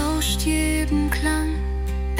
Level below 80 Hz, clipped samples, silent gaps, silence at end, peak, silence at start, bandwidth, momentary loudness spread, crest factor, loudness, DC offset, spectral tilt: -26 dBFS; under 0.1%; none; 0 s; -8 dBFS; 0 s; 16.5 kHz; 5 LU; 14 dB; -23 LUFS; under 0.1%; -4.5 dB/octave